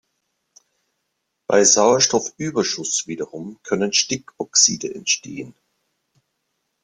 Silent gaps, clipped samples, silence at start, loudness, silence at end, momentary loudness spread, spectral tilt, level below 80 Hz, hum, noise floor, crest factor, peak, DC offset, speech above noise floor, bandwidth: none; under 0.1%; 1.5 s; -18 LUFS; 1.35 s; 20 LU; -2 dB/octave; -64 dBFS; none; -75 dBFS; 20 dB; -2 dBFS; under 0.1%; 55 dB; 11 kHz